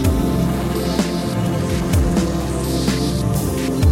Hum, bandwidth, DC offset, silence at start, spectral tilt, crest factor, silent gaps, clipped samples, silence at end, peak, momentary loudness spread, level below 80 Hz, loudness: none; 16.5 kHz; under 0.1%; 0 s; -6 dB/octave; 14 dB; none; under 0.1%; 0 s; -4 dBFS; 3 LU; -26 dBFS; -19 LUFS